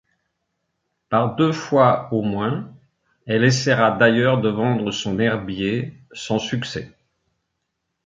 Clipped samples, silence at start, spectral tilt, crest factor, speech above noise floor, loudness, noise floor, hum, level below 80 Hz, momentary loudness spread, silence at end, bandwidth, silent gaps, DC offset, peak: under 0.1%; 1.1 s; -5.5 dB/octave; 20 dB; 57 dB; -20 LUFS; -77 dBFS; none; -54 dBFS; 12 LU; 1.2 s; 7.6 kHz; none; under 0.1%; -2 dBFS